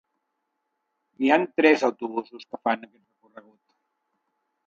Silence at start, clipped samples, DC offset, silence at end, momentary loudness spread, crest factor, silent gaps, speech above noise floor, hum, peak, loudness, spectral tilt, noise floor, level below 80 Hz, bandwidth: 1.2 s; under 0.1%; under 0.1%; 1.8 s; 13 LU; 24 dB; none; 55 dB; none; -4 dBFS; -23 LUFS; -5 dB/octave; -79 dBFS; -80 dBFS; 7.6 kHz